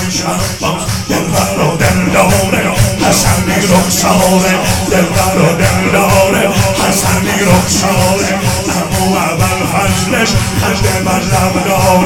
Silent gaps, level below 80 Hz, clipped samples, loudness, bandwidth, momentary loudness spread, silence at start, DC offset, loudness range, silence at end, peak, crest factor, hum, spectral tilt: none; -26 dBFS; 0.2%; -11 LUFS; 18 kHz; 4 LU; 0 s; under 0.1%; 2 LU; 0 s; 0 dBFS; 10 dB; none; -4.5 dB/octave